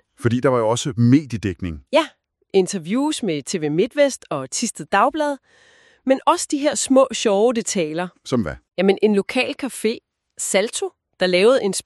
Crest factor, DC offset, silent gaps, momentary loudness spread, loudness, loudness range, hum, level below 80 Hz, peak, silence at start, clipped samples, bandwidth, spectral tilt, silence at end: 16 dB; under 0.1%; none; 10 LU; -20 LUFS; 2 LU; none; -52 dBFS; -2 dBFS; 0.2 s; under 0.1%; 13 kHz; -4.5 dB/octave; 0.05 s